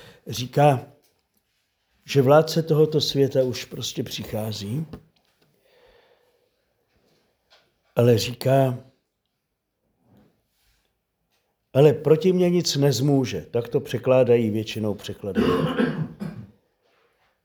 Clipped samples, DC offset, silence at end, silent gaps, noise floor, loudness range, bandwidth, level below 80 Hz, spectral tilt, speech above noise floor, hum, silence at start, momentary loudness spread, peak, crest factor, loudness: under 0.1%; under 0.1%; 1 s; none; -78 dBFS; 12 LU; over 20 kHz; -58 dBFS; -6 dB/octave; 57 dB; none; 0.25 s; 13 LU; -4 dBFS; 20 dB; -22 LUFS